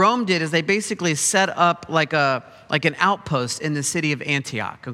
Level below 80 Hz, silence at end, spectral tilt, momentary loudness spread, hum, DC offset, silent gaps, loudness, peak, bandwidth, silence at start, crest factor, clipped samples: -60 dBFS; 0 s; -3.5 dB/octave; 6 LU; none; under 0.1%; none; -21 LUFS; -2 dBFS; 15.5 kHz; 0 s; 20 dB; under 0.1%